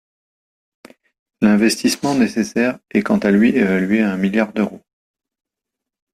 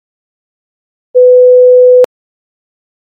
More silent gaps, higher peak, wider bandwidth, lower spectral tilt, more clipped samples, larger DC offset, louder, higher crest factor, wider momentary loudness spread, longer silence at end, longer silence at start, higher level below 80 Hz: neither; about the same, -2 dBFS vs 0 dBFS; first, 14 kHz vs 2.9 kHz; about the same, -5.5 dB/octave vs -4.5 dB/octave; neither; neither; second, -17 LUFS vs -6 LUFS; first, 18 dB vs 8 dB; second, 6 LU vs 9 LU; first, 1.35 s vs 1.1 s; first, 1.4 s vs 1.15 s; first, -56 dBFS vs -66 dBFS